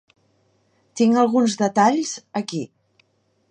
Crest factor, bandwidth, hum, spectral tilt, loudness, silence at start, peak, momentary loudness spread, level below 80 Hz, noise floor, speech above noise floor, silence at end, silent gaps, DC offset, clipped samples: 18 dB; 9.8 kHz; none; -5 dB/octave; -20 LUFS; 0.95 s; -4 dBFS; 14 LU; -74 dBFS; -65 dBFS; 46 dB; 0.85 s; none; under 0.1%; under 0.1%